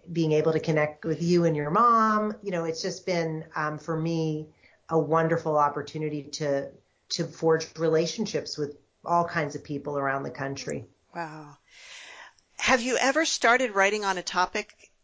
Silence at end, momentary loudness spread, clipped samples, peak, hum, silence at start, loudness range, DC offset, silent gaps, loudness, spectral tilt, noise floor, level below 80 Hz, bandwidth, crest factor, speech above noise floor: 0.4 s; 16 LU; under 0.1%; -10 dBFS; none; 0.05 s; 6 LU; under 0.1%; none; -26 LUFS; -4.5 dB/octave; -50 dBFS; -64 dBFS; 8 kHz; 18 dB; 23 dB